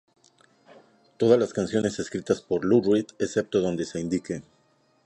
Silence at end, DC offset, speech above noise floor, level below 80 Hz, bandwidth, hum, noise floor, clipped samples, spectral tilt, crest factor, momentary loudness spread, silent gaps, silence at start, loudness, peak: 0.65 s; under 0.1%; 41 dB; -58 dBFS; 11 kHz; none; -65 dBFS; under 0.1%; -6 dB/octave; 20 dB; 9 LU; none; 1.2 s; -25 LUFS; -6 dBFS